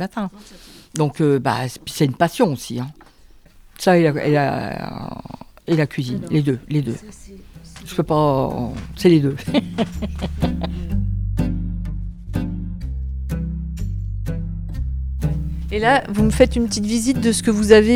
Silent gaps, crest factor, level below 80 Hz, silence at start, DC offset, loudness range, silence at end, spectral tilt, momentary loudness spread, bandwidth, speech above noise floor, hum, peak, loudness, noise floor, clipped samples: none; 20 dB; -30 dBFS; 0 s; under 0.1%; 6 LU; 0 s; -6 dB/octave; 13 LU; 16.5 kHz; 28 dB; none; 0 dBFS; -20 LUFS; -47 dBFS; under 0.1%